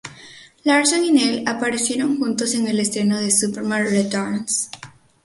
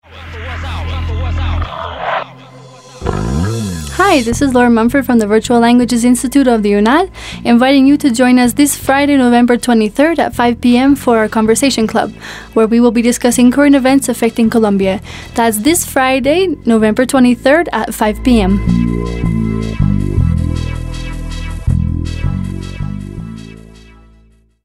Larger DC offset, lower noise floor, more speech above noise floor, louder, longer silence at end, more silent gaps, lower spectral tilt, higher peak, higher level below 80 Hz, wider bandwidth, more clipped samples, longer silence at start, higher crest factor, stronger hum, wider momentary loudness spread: neither; about the same, -44 dBFS vs -47 dBFS; second, 25 dB vs 37 dB; second, -19 LUFS vs -12 LUFS; second, 0.35 s vs 1.05 s; neither; second, -3 dB/octave vs -5.5 dB/octave; second, -4 dBFS vs 0 dBFS; second, -62 dBFS vs -26 dBFS; second, 12 kHz vs 16 kHz; neither; about the same, 0.05 s vs 0.1 s; about the same, 16 dB vs 12 dB; neither; second, 7 LU vs 13 LU